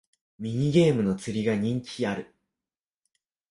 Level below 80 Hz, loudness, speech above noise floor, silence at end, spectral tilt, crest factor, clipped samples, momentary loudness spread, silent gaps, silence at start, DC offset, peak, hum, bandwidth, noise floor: -60 dBFS; -26 LUFS; over 65 dB; 1.25 s; -7 dB/octave; 18 dB; under 0.1%; 12 LU; none; 0.4 s; under 0.1%; -10 dBFS; none; 11.5 kHz; under -90 dBFS